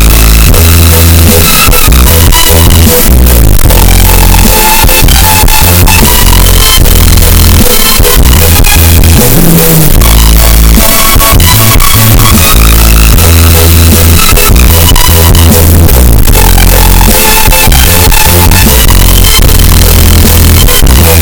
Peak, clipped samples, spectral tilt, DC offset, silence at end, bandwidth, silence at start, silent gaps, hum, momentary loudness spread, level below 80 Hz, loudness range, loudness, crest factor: 0 dBFS; 40%; -3.5 dB/octave; under 0.1%; 0 s; over 20 kHz; 0 s; none; none; 1 LU; -6 dBFS; 0 LU; -2 LUFS; 2 dB